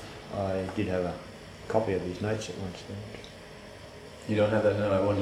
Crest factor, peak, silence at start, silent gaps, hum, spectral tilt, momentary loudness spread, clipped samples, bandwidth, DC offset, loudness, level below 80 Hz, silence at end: 20 dB; -12 dBFS; 0 s; none; none; -6.5 dB/octave; 20 LU; under 0.1%; 14 kHz; under 0.1%; -30 LUFS; -56 dBFS; 0 s